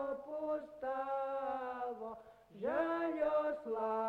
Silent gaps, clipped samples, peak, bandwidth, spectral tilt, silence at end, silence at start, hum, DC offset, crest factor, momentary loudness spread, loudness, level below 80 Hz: none; under 0.1%; -22 dBFS; 6.2 kHz; -6.5 dB/octave; 0 s; 0 s; none; under 0.1%; 16 dB; 10 LU; -39 LUFS; -74 dBFS